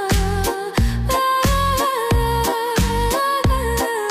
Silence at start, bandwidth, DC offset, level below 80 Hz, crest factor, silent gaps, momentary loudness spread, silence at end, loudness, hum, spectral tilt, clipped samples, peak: 0 s; 16 kHz; under 0.1%; -24 dBFS; 10 dB; none; 4 LU; 0 s; -19 LUFS; none; -4.5 dB/octave; under 0.1%; -8 dBFS